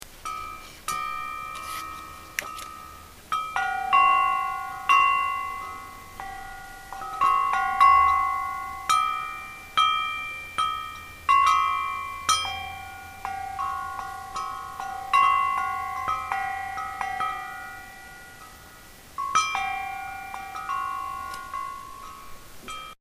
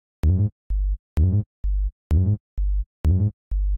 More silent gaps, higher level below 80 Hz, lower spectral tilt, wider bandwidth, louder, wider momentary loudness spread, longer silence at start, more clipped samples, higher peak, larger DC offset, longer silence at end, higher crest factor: second, none vs 0.52-0.70 s, 0.99-1.16 s, 1.46-1.63 s, 1.92-2.10 s, 2.40-2.57 s, 2.86-3.04 s, 3.33-3.51 s; second, -52 dBFS vs -24 dBFS; second, -0.5 dB/octave vs -10.5 dB/octave; first, 15.5 kHz vs 3.2 kHz; about the same, -25 LUFS vs -24 LUFS; first, 20 LU vs 7 LU; second, 0 s vs 0.25 s; neither; first, -6 dBFS vs -12 dBFS; neither; about the same, 0.05 s vs 0 s; first, 20 dB vs 10 dB